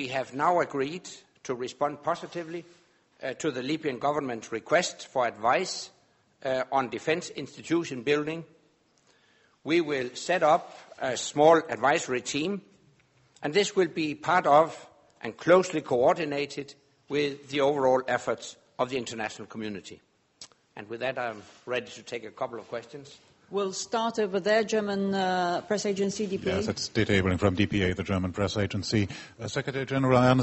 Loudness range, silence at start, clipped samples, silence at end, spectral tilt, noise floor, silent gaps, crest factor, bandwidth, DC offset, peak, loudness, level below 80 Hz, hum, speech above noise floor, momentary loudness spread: 9 LU; 0 s; under 0.1%; 0 s; -5 dB/octave; -66 dBFS; none; 22 dB; 8.2 kHz; under 0.1%; -6 dBFS; -28 LUFS; -60 dBFS; none; 38 dB; 16 LU